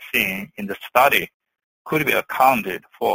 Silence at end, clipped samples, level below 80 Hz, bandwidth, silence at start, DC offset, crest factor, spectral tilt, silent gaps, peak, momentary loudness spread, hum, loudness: 0 s; under 0.1%; -56 dBFS; 16.5 kHz; 0 s; under 0.1%; 20 dB; -4 dB/octave; 1.34-1.40 s, 1.64-1.85 s; -2 dBFS; 14 LU; none; -19 LUFS